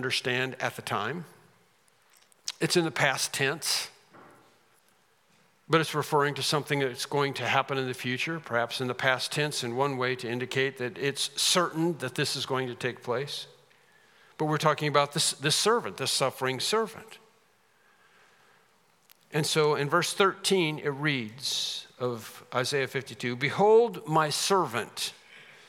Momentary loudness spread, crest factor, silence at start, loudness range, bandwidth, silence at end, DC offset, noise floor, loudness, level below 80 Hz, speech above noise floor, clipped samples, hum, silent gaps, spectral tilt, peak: 10 LU; 22 dB; 0 s; 4 LU; 17.5 kHz; 0.25 s; under 0.1%; -66 dBFS; -28 LUFS; -80 dBFS; 38 dB; under 0.1%; none; none; -3.5 dB/octave; -6 dBFS